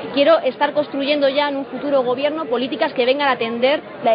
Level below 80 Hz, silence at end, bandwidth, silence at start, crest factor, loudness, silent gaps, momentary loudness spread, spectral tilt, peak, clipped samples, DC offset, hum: -68 dBFS; 0 s; 5.2 kHz; 0 s; 16 dB; -18 LUFS; none; 6 LU; -1.5 dB/octave; -2 dBFS; under 0.1%; under 0.1%; none